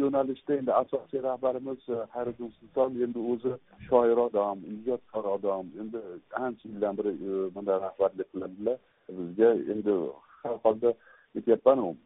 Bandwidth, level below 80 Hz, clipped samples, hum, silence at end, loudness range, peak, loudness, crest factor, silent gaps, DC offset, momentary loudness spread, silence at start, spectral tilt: 3.9 kHz; -68 dBFS; under 0.1%; none; 0.1 s; 4 LU; -8 dBFS; -29 LUFS; 20 dB; none; under 0.1%; 14 LU; 0 s; -4 dB/octave